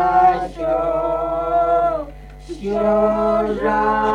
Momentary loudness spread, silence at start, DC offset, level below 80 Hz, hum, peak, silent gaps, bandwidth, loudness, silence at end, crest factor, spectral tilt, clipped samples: 9 LU; 0 s; under 0.1%; -38 dBFS; none; -4 dBFS; none; 9.4 kHz; -18 LUFS; 0 s; 14 dB; -7 dB/octave; under 0.1%